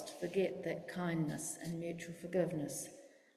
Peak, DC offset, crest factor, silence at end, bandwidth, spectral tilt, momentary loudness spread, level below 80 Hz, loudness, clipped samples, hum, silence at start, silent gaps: -22 dBFS; under 0.1%; 18 dB; 0.25 s; 15.5 kHz; -5.5 dB/octave; 8 LU; -74 dBFS; -40 LUFS; under 0.1%; none; 0 s; none